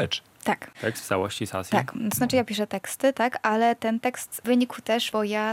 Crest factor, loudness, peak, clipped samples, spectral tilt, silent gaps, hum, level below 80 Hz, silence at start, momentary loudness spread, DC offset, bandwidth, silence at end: 18 dB; -26 LUFS; -8 dBFS; under 0.1%; -4 dB/octave; none; none; -66 dBFS; 0 s; 6 LU; under 0.1%; 17 kHz; 0 s